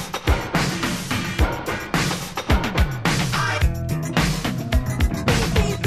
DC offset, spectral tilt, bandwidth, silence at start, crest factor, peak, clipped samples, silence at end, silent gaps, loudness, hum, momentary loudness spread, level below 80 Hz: under 0.1%; -5 dB/octave; 15.5 kHz; 0 s; 18 dB; -4 dBFS; under 0.1%; 0 s; none; -22 LUFS; none; 4 LU; -26 dBFS